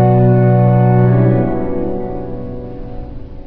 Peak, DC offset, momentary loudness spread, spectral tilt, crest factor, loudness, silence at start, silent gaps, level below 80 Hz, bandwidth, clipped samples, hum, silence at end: -2 dBFS; under 0.1%; 19 LU; -13 dB/octave; 12 dB; -13 LUFS; 0 s; none; -30 dBFS; 3.1 kHz; under 0.1%; none; 0 s